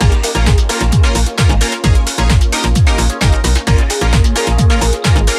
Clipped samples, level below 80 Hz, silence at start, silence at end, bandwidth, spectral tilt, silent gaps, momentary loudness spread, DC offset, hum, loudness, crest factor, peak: under 0.1%; -14 dBFS; 0 s; 0 s; 13.5 kHz; -4.5 dB/octave; none; 1 LU; under 0.1%; none; -13 LUFS; 10 dB; 0 dBFS